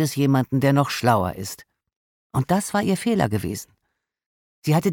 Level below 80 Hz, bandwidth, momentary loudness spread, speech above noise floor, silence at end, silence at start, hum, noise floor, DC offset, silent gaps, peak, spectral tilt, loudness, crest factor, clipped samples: -52 dBFS; 17.5 kHz; 12 LU; 56 dB; 0 s; 0 s; none; -77 dBFS; under 0.1%; 1.96-2.30 s, 4.26-4.62 s; -4 dBFS; -6 dB/octave; -22 LUFS; 18 dB; under 0.1%